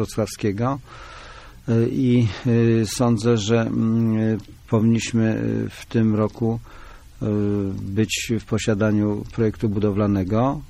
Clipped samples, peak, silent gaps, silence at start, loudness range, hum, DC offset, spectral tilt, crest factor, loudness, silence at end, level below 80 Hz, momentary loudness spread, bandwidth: under 0.1%; -8 dBFS; none; 0 s; 3 LU; none; under 0.1%; -6.5 dB/octave; 14 dB; -21 LUFS; 0.05 s; -44 dBFS; 8 LU; 14 kHz